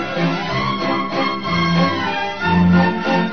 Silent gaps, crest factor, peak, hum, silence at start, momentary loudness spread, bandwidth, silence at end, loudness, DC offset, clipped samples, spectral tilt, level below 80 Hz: none; 14 dB; -4 dBFS; none; 0 s; 6 LU; 6.4 kHz; 0 s; -18 LUFS; 1%; under 0.1%; -7 dB/octave; -44 dBFS